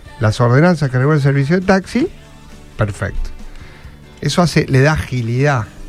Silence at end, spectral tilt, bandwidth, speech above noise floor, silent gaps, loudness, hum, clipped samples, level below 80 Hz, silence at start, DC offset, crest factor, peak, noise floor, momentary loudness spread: 0 s; -6.5 dB/octave; 13 kHz; 23 dB; none; -15 LUFS; none; under 0.1%; -32 dBFS; 0.05 s; under 0.1%; 14 dB; 0 dBFS; -37 dBFS; 11 LU